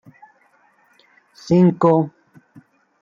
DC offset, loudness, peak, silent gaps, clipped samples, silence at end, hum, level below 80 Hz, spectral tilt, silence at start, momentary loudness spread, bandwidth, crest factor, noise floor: under 0.1%; -17 LUFS; -4 dBFS; none; under 0.1%; 0.9 s; none; -64 dBFS; -9 dB/octave; 1.45 s; 15 LU; 7.2 kHz; 18 dB; -58 dBFS